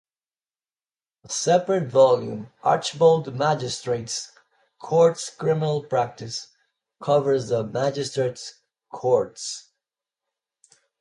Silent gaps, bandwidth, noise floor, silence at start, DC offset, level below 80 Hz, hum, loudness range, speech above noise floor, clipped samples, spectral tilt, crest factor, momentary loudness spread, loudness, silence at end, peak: none; 11.5 kHz; under -90 dBFS; 1.3 s; under 0.1%; -66 dBFS; none; 5 LU; over 68 dB; under 0.1%; -5 dB/octave; 18 dB; 15 LU; -23 LUFS; 1.4 s; -6 dBFS